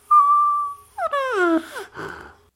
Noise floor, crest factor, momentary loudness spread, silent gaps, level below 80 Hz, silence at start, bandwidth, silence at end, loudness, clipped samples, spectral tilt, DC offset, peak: -39 dBFS; 14 dB; 20 LU; none; -60 dBFS; 0.1 s; 15.5 kHz; 0.3 s; -19 LUFS; under 0.1%; -4.5 dB/octave; under 0.1%; -6 dBFS